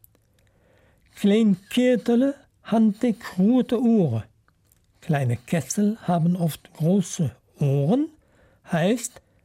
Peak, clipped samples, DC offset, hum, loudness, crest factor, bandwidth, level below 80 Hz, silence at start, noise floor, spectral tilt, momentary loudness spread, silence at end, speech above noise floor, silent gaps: -10 dBFS; under 0.1%; under 0.1%; none; -23 LUFS; 12 dB; 16 kHz; -62 dBFS; 1.15 s; -62 dBFS; -6.5 dB/octave; 8 LU; 0.35 s; 41 dB; none